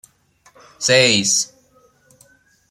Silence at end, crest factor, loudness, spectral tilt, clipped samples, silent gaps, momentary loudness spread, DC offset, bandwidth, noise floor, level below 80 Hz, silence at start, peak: 1.25 s; 20 dB; -15 LUFS; -2 dB/octave; under 0.1%; none; 11 LU; under 0.1%; 15 kHz; -56 dBFS; -64 dBFS; 0.8 s; -2 dBFS